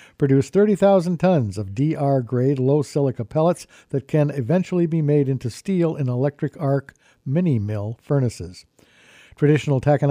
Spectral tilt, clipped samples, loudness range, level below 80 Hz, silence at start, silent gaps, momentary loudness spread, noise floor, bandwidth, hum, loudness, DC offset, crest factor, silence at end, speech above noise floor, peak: -8.5 dB/octave; under 0.1%; 4 LU; -56 dBFS; 0.2 s; none; 9 LU; -50 dBFS; 11.5 kHz; none; -21 LUFS; under 0.1%; 14 dB; 0 s; 30 dB; -6 dBFS